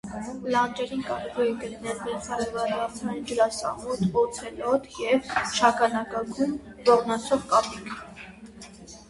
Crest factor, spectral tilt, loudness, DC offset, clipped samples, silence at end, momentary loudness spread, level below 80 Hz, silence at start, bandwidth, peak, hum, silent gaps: 22 dB; -4 dB/octave; -26 LUFS; under 0.1%; under 0.1%; 0.05 s; 16 LU; -56 dBFS; 0.05 s; 11.5 kHz; -4 dBFS; none; none